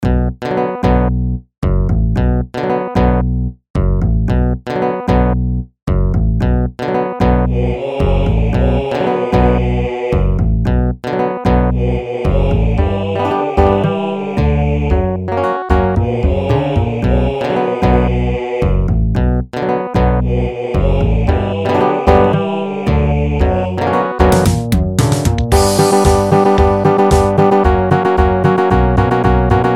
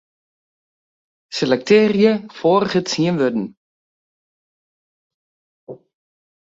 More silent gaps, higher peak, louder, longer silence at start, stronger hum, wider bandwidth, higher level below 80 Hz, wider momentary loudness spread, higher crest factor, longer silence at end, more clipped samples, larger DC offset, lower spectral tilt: second, 1.58-1.62 s, 3.70-3.74 s, 5.83-5.87 s vs 3.57-5.67 s; about the same, 0 dBFS vs -2 dBFS; first, -14 LUFS vs -17 LUFS; second, 0 s vs 1.3 s; neither; first, 14.5 kHz vs 7.8 kHz; first, -18 dBFS vs -62 dBFS; second, 7 LU vs 11 LU; second, 12 dB vs 20 dB; second, 0 s vs 0.75 s; neither; neither; first, -7 dB/octave vs -5.5 dB/octave